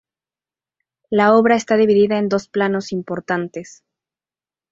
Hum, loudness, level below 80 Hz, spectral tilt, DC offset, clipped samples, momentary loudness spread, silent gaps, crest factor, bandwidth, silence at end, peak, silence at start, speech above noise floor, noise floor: none; -17 LUFS; -62 dBFS; -6 dB/octave; under 0.1%; under 0.1%; 12 LU; none; 18 dB; 7.8 kHz; 1.1 s; -2 dBFS; 1.1 s; over 73 dB; under -90 dBFS